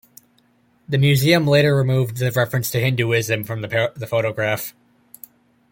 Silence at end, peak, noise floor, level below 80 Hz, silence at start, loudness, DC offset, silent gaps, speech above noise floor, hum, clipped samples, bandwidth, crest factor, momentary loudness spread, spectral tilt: 1 s; -2 dBFS; -59 dBFS; -56 dBFS; 0.9 s; -19 LUFS; under 0.1%; none; 41 dB; none; under 0.1%; 17 kHz; 18 dB; 9 LU; -5.5 dB/octave